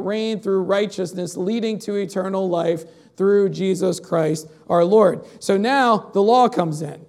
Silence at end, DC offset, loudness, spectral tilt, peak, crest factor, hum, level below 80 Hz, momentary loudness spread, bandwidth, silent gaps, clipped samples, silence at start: 0.05 s; under 0.1%; -20 LUFS; -6 dB/octave; -4 dBFS; 16 dB; none; -72 dBFS; 9 LU; 14 kHz; none; under 0.1%; 0 s